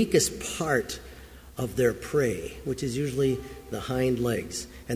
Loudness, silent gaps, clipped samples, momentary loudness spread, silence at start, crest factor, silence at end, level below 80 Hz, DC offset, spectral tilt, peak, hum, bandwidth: -28 LUFS; none; under 0.1%; 12 LU; 0 s; 20 dB; 0 s; -48 dBFS; under 0.1%; -4.5 dB/octave; -8 dBFS; none; 16 kHz